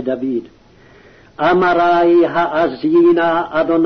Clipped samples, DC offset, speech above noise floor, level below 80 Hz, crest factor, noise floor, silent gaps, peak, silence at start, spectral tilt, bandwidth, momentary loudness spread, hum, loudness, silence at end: under 0.1%; under 0.1%; 31 dB; -50 dBFS; 10 dB; -45 dBFS; none; -4 dBFS; 0 s; -7.5 dB/octave; 6 kHz; 9 LU; none; -14 LUFS; 0 s